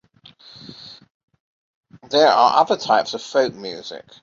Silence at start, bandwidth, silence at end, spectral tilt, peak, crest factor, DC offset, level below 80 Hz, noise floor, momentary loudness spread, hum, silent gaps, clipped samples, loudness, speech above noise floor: 0.7 s; 7.6 kHz; 0.25 s; -3.5 dB/octave; -2 dBFS; 20 dB; under 0.1%; -66 dBFS; -48 dBFS; 24 LU; none; 1.10-1.28 s, 1.40-1.83 s; under 0.1%; -17 LUFS; 30 dB